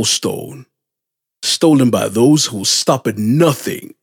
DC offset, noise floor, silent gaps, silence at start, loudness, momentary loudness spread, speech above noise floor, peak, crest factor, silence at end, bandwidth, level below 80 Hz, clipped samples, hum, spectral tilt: under 0.1%; -82 dBFS; none; 0 s; -14 LUFS; 11 LU; 67 dB; 0 dBFS; 14 dB; 0.15 s; 18.5 kHz; -64 dBFS; under 0.1%; none; -4 dB/octave